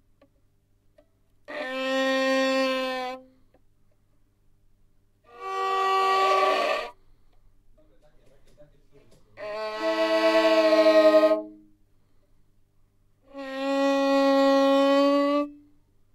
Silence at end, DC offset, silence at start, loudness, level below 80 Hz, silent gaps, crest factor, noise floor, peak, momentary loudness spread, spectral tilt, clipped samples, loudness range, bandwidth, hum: 0.6 s; under 0.1%; 1.5 s; -23 LUFS; -64 dBFS; none; 18 dB; -65 dBFS; -8 dBFS; 18 LU; -3 dB/octave; under 0.1%; 9 LU; 15.5 kHz; none